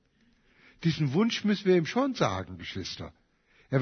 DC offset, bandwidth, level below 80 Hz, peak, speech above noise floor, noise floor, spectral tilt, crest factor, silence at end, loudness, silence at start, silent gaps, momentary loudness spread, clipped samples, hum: under 0.1%; 6.6 kHz; -60 dBFS; -10 dBFS; 38 dB; -66 dBFS; -6 dB/octave; 18 dB; 0 s; -28 LUFS; 0.85 s; none; 13 LU; under 0.1%; none